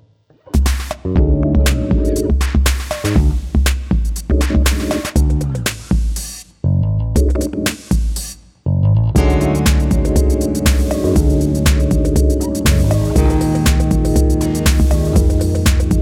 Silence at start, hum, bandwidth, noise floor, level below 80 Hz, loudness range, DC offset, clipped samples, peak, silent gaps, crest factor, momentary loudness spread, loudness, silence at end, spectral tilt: 0.55 s; none; 17 kHz; -47 dBFS; -16 dBFS; 3 LU; under 0.1%; under 0.1%; 0 dBFS; none; 14 dB; 5 LU; -16 LUFS; 0 s; -6 dB/octave